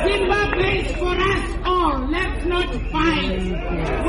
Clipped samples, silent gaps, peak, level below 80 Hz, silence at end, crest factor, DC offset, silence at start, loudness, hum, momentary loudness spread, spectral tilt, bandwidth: under 0.1%; none; -6 dBFS; -26 dBFS; 0 s; 14 dB; under 0.1%; 0 s; -21 LUFS; none; 5 LU; -5.5 dB/octave; 11 kHz